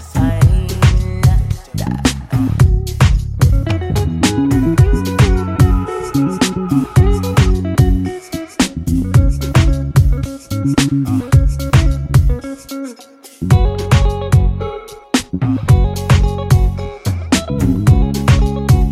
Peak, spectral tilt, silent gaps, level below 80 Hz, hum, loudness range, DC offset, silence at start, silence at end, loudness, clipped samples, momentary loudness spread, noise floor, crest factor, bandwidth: 0 dBFS; -6.5 dB/octave; none; -18 dBFS; none; 2 LU; under 0.1%; 0 s; 0 s; -15 LUFS; under 0.1%; 8 LU; -39 dBFS; 12 dB; 15.5 kHz